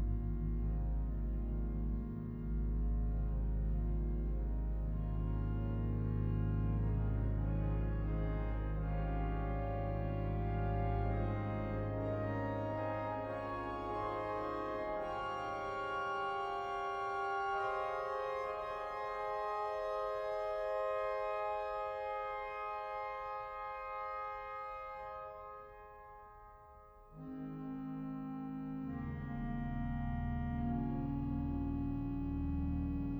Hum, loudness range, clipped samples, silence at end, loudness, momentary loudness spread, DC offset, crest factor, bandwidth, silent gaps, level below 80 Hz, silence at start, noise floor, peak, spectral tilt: none; 8 LU; under 0.1%; 0 s; -39 LUFS; 7 LU; under 0.1%; 12 dB; 6 kHz; none; -42 dBFS; 0 s; -58 dBFS; -24 dBFS; -9 dB/octave